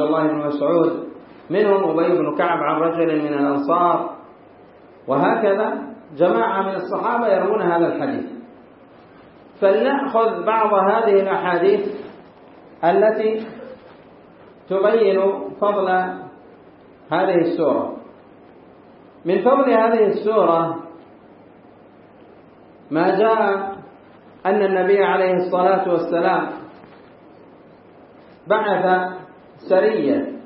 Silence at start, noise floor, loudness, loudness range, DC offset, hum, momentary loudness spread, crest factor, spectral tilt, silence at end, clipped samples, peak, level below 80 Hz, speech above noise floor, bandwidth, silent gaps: 0 s; -46 dBFS; -19 LUFS; 4 LU; under 0.1%; none; 14 LU; 18 dB; -11 dB/octave; 0 s; under 0.1%; -2 dBFS; -70 dBFS; 29 dB; 5.6 kHz; none